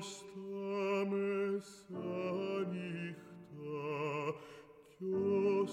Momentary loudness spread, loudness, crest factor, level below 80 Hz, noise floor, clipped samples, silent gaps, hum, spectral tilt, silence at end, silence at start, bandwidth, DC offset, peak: 15 LU; -38 LUFS; 14 dB; -80 dBFS; -57 dBFS; under 0.1%; none; none; -6.5 dB/octave; 0 s; 0 s; 11 kHz; under 0.1%; -24 dBFS